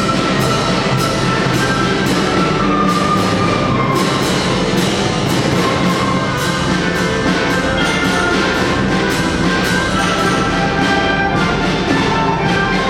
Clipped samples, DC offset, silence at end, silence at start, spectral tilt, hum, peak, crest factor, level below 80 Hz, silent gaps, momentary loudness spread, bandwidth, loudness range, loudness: under 0.1%; under 0.1%; 0 s; 0 s; -5 dB/octave; none; -2 dBFS; 12 dB; -32 dBFS; none; 1 LU; 17 kHz; 1 LU; -14 LUFS